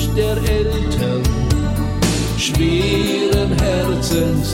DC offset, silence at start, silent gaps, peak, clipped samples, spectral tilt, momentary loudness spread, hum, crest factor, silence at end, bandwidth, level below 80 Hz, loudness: under 0.1%; 0 s; none; -4 dBFS; under 0.1%; -5.5 dB/octave; 2 LU; none; 12 dB; 0 s; 17 kHz; -24 dBFS; -17 LUFS